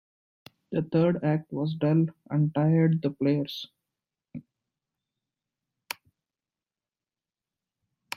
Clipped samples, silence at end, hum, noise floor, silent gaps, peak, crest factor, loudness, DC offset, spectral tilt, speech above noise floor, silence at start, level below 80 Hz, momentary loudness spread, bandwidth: under 0.1%; 3.75 s; none; under -90 dBFS; none; -12 dBFS; 18 dB; -26 LUFS; under 0.1%; -8 dB/octave; over 65 dB; 0.7 s; -70 dBFS; 21 LU; 14 kHz